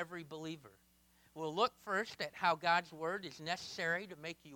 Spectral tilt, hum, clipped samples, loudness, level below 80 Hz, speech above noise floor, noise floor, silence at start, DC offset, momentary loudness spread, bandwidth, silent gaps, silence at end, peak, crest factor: -3.5 dB/octave; none; under 0.1%; -38 LUFS; -78 dBFS; 31 dB; -70 dBFS; 0 s; under 0.1%; 13 LU; 19 kHz; none; 0 s; -20 dBFS; 20 dB